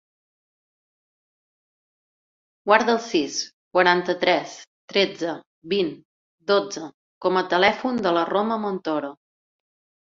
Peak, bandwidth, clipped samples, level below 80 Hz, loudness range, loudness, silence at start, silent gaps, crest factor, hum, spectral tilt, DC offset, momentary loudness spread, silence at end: -2 dBFS; 7.6 kHz; under 0.1%; -66 dBFS; 4 LU; -22 LUFS; 2.65 s; 3.53-3.71 s, 4.67-4.88 s, 5.46-5.62 s, 6.05-6.38 s, 6.94-7.21 s; 22 dB; none; -4 dB/octave; under 0.1%; 16 LU; 0.9 s